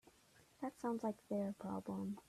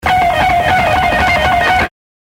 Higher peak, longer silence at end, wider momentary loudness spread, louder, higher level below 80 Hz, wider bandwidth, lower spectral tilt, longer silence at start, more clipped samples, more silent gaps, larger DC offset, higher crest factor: second, -30 dBFS vs 0 dBFS; second, 0.1 s vs 0.3 s; first, 6 LU vs 2 LU; second, -44 LUFS vs -12 LUFS; second, -80 dBFS vs -28 dBFS; second, 14 kHz vs 16.5 kHz; first, -7.5 dB/octave vs -4.5 dB/octave; about the same, 0.05 s vs 0.05 s; neither; neither; neither; about the same, 16 dB vs 12 dB